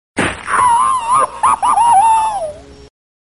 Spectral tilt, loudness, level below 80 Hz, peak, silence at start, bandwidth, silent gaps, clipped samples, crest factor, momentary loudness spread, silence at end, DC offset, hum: -2.5 dB/octave; -13 LUFS; -44 dBFS; -2 dBFS; 0.15 s; 11.5 kHz; none; under 0.1%; 12 dB; 9 LU; 0.6 s; 0.3%; 60 Hz at -45 dBFS